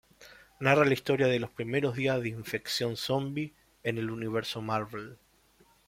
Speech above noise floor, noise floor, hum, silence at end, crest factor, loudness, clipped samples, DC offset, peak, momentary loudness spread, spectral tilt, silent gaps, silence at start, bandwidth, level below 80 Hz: 34 dB; -64 dBFS; none; 0.7 s; 22 dB; -30 LUFS; under 0.1%; under 0.1%; -8 dBFS; 12 LU; -5.5 dB/octave; none; 0.2 s; 16.5 kHz; -64 dBFS